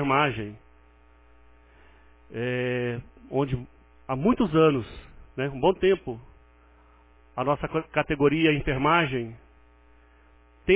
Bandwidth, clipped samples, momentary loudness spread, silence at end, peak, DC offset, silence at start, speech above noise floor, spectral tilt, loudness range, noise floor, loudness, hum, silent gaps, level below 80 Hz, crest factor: 4 kHz; under 0.1%; 18 LU; 0 s; -8 dBFS; under 0.1%; 0 s; 32 dB; -10.5 dB/octave; 7 LU; -56 dBFS; -25 LUFS; none; none; -48 dBFS; 20 dB